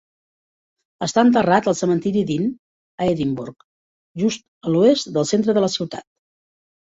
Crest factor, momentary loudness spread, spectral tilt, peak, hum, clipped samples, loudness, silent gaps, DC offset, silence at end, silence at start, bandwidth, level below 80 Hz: 18 dB; 13 LU; -5.5 dB/octave; -2 dBFS; none; under 0.1%; -20 LUFS; 2.59-2.98 s, 3.64-4.15 s, 4.48-4.61 s; under 0.1%; 0.8 s; 1 s; 8 kHz; -58 dBFS